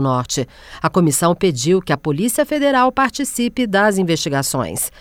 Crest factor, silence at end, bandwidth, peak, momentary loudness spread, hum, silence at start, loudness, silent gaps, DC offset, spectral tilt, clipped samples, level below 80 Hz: 14 dB; 0.1 s; 18.5 kHz; -2 dBFS; 6 LU; none; 0 s; -17 LUFS; none; under 0.1%; -4.5 dB/octave; under 0.1%; -46 dBFS